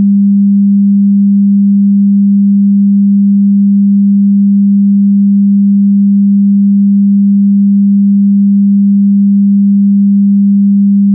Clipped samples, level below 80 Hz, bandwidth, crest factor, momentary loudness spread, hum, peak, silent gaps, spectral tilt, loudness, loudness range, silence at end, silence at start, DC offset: under 0.1%; -66 dBFS; 0.3 kHz; 4 dB; 0 LU; none; -4 dBFS; none; -20.5 dB/octave; -7 LUFS; 0 LU; 0 s; 0 s; under 0.1%